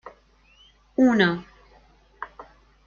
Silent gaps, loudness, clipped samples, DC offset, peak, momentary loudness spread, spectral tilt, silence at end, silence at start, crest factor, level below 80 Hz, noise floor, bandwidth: none; -22 LUFS; under 0.1%; under 0.1%; -6 dBFS; 22 LU; -6.5 dB/octave; 0.45 s; 0.05 s; 20 dB; -58 dBFS; -57 dBFS; 7.2 kHz